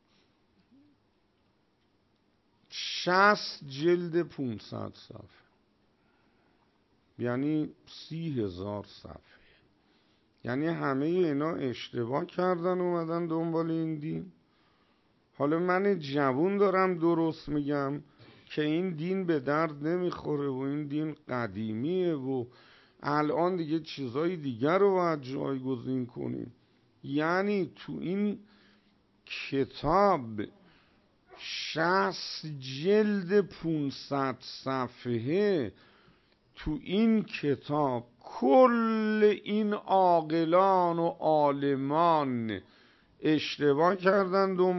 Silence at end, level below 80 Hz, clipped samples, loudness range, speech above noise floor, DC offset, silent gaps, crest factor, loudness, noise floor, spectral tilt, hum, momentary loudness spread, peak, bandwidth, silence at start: 0 s; -62 dBFS; under 0.1%; 10 LU; 42 dB; under 0.1%; none; 22 dB; -29 LUFS; -71 dBFS; -7 dB/octave; none; 13 LU; -8 dBFS; 6.2 kHz; 2.7 s